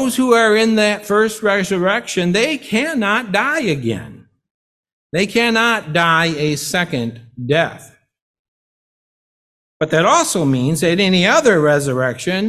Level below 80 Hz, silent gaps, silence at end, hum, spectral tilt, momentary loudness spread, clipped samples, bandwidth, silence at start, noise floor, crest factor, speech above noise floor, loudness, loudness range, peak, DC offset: -54 dBFS; 4.51-4.83 s, 4.93-5.10 s, 8.22-9.80 s; 0 s; none; -4.5 dB/octave; 9 LU; under 0.1%; 14.5 kHz; 0 s; under -90 dBFS; 16 dB; over 74 dB; -15 LUFS; 6 LU; 0 dBFS; under 0.1%